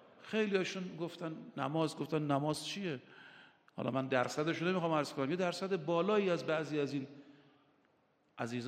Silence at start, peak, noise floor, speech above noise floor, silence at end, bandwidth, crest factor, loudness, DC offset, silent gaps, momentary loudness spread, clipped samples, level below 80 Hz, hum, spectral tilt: 0.2 s; -16 dBFS; -74 dBFS; 38 dB; 0 s; 15 kHz; 20 dB; -36 LUFS; under 0.1%; none; 11 LU; under 0.1%; -82 dBFS; none; -5.5 dB/octave